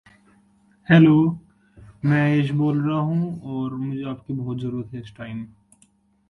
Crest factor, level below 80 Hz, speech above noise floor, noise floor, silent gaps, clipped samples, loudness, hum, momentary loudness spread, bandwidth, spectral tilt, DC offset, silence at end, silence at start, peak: 20 dB; -58 dBFS; 40 dB; -60 dBFS; none; under 0.1%; -21 LUFS; none; 20 LU; 4.8 kHz; -9 dB/octave; under 0.1%; 0.85 s; 0.9 s; -2 dBFS